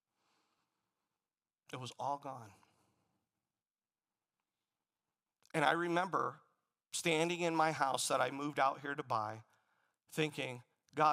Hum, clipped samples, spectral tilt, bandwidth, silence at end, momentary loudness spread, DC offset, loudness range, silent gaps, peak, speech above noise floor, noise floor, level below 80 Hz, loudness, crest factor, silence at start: none; under 0.1%; -4 dB/octave; 15.5 kHz; 0 s; 14 LU; under 0.1%; 14 LU; none; -16 dBFS; over 53 dB; under -90 dBFS; -88 dBFS; -36 LUFS; 24 dB; 1.7 s